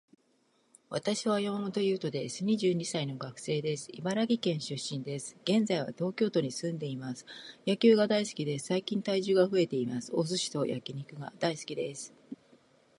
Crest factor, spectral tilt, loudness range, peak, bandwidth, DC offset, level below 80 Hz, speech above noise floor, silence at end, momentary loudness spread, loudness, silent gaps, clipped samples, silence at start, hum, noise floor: 20 dB; -5 dB/octave; 4 LU; -12 dBFS; 11.5 kHz; under 0.1%; -78 dBFS; 40 dB; 0.65 s; 13 LU; -31 LUFS; none; under 0.1%; 0.9 s; none; -71 dBFS